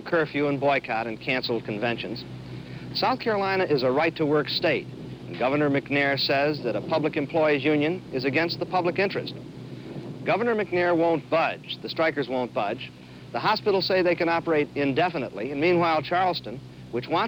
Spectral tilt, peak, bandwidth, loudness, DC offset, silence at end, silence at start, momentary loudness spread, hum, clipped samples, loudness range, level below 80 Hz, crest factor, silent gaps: -7 dB/octave; -12 dBFS; over 20 kHz; -25 LUFS; under 0.1%; 0 s; 0 s; 14 LU; none; under 0.1%; 2 LU; -58 dBFS; 14 dB; none